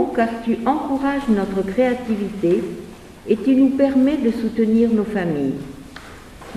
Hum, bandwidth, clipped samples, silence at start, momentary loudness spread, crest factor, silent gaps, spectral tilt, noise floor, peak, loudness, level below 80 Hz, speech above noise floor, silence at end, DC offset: none; 13 kHz; under 0.1%; 0 s; 21 LU; 14 dB; none; -7.5 dB/octave; -39 dBFS; -4 dBFS; -19 LUFS; -46 dBFS; 20 dB; 0 s; under 0.1%